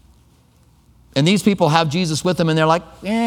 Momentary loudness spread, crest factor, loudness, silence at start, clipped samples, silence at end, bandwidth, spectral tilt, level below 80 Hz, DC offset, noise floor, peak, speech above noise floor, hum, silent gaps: 5 LU; 18 dB; -17 LUFS; 1.15 s; under 0.1%; 0 s; 16 kHz; -5.5 dB/octave; -50 dBFS; under 0.1%; -53 dBFS; 0 dBFS; 36 dB; none; none